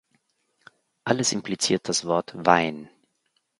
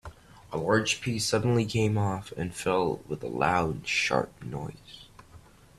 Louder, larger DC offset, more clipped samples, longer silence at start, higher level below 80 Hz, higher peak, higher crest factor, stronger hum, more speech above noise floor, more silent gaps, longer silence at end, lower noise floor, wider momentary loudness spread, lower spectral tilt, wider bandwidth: first, -24 LUFS vs -28 LUFS; neither; neither; first, 1.05 s vs 0.05 s; second, -64 dBFS vs -54 dBFS; first, 0 dBFS vs -8 dBFS; first, 26 dB vs 20 dB; neither; first, 49 dB vs 25 dB; neither; first, 0.75 s vs 0.4 s; first, -73 dBFS vs -53 dBFS; second, 9 LU vs 13 LU; second, -3 dB/octave vs -5 dB/octave; second, 11.5 kHz vs 14 kHz